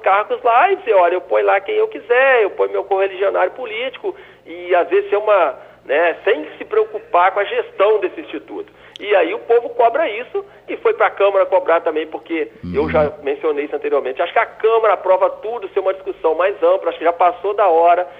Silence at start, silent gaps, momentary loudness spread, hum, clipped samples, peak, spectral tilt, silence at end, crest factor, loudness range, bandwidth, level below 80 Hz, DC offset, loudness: 0 s; none; 10 LU; none; under 0.1%; -2 dBFS; -7 dB/octave; 0 s; 14 dB; 2 LU; 5 kHz; -56 dBFS; under 0.1%; -17 LUFS